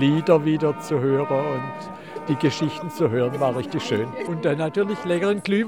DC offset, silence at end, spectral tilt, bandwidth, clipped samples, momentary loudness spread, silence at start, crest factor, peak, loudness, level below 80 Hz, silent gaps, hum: 0.2%; 0 s; -7 dB/octave; 16.5 kHz; under 0.1%; 9 LU; 0 s; 18 dB; -4 dBFS; -23 LUFS; -66 dBFS; none; none